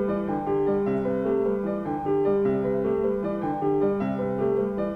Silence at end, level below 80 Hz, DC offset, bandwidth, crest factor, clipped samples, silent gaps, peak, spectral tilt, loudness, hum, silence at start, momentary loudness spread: 0 s; -50 dBFS; under 0.1%; 4.3 kHz; 12 dB; under 0.1%; none; -14 dBFS; -10 dB/octave; -25 LUFS; none; 0 s; 4 LU